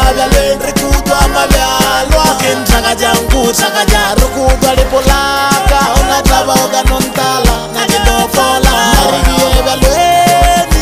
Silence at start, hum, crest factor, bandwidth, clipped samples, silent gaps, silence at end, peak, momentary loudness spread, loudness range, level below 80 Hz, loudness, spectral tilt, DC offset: 0 s; none; 10 dB; 16 kHz; 0.1%; none; 0 s; 0 dBFS; 3 LU; 1 LU; -14 dBFS; -10 LUFS; -3.5 dB/octave; 0.7%